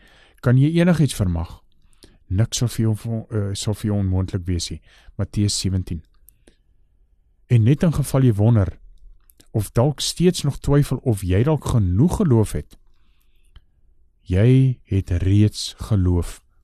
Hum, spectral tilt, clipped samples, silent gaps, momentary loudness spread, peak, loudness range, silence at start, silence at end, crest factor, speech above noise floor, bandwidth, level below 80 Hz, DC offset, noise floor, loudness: none; -6.5 dB/octave; under 0.1%; none; 11 LU; -4 dBFS; 5 LU; 0.45 s; 0.3 s; 16 dB; 39 dB; 13 kHz; -38 dBFS; under 0.1%; -58 dBFS; -20 LUFS